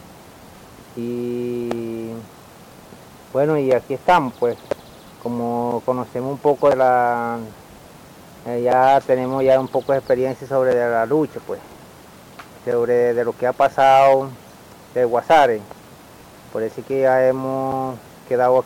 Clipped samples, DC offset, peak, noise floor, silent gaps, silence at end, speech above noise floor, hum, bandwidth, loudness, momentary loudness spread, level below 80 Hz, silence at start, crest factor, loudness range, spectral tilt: under 0.1%; under 0.1%; -6 dBFS; -43 dBFS; none; 0 s; 25 dB; none; 17 kHz; -19 LUFS; 16 LU; -56 dBFS; 0.1 s; 14 dB; 4 LU; -6.5 dB/octave